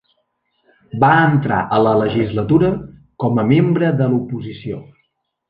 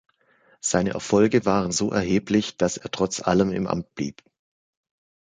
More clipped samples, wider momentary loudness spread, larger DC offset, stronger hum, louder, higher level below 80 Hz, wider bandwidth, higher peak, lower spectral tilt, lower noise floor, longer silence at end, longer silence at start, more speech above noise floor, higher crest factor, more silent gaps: neither; first, 14 LU vs 9 LU; neither; neither; first, -16 LUFS vs -23 LUFS; first, -46 dBFS vs -52 dBFS; second, 5 kHz vs 9.6 kHz; first, -2 dBFS vs -6 dBFS; first, -10.5 dB/octave vs -5 dB/octave; first, -68 dBFS vs -61 dBFS; second, 0.7 s vs 1.15 s; first, 0.95 s vs 0.65 s; first, 52 dB vs 38 dB; about the same, 16 dB vs 20 dB; neither